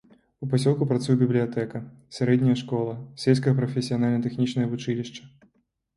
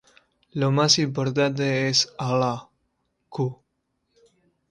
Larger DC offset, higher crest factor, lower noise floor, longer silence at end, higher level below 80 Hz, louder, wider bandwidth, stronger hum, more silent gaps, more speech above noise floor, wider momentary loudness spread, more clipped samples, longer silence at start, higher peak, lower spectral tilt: neither; about the same, 20 dB vs 22 dB; second, -69 dBFS vs -75 dBFS; second, 0.7 s vs 1.15 s; about the same, -62 dBFS vs -64 dBFS; second, -25 LUFS vs -22 LUFS; about the same, 11.5 kHz vs 11 kHz; neither; neither; second, 45 dB vs 52 dB; about the same, 11 LU vs 13 LU; neither; second, 0.4 s vs 0.55 s; about the same, -6 dBFS vs -4 dBFS; first, -7.5 dB/octave vs -4 dB/octave